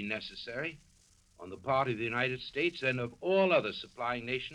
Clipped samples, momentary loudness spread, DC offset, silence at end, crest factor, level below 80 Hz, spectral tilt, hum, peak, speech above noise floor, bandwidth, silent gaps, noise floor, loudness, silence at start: under 0.1%; 12 LU; under 0.1%; 0 s; 20 dB; -66 dBFS; -6 dB/octave; none; -14 dBFS; 32 dB; 11 kHz; none; -65 dBFS; -33 LUFS; 0 s